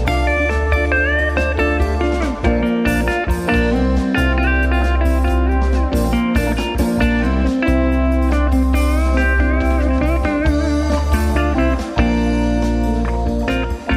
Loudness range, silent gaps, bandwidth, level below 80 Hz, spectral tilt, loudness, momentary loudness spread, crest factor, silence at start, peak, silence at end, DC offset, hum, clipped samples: 1 LU; none; 15 kHz; -18 dBFS; -7 dB/octave; -17 LUFS; 3 LU; 14 dB; 0 s; -2 dBFS; 0 s; under 0.1%; none; under 0.1%